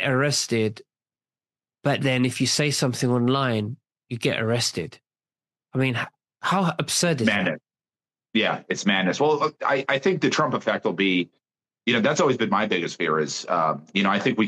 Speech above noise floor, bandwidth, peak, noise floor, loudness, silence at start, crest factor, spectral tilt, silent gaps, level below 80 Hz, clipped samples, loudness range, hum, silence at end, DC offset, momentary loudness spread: over 67 dB; 12.5 kHz; -6 dBFS; under -90 dBFS; -23 LUFS; 0 s; 18 dB; -4.5 dB/octave; none; -68 dBFS; under 0.1%; 3 LU; none; 0 s; under 0.1%; 8 LU